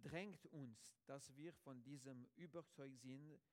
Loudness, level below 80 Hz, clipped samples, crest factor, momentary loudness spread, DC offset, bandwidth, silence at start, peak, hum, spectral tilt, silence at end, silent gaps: -59 LUFS; -86 dBFS; under 0.1%; 22 dB; 5 LU; under 0.1%; 16.5 kHz; 0 s; -36 dBFS; none; -5.5 dB/octave; 0.15 s; none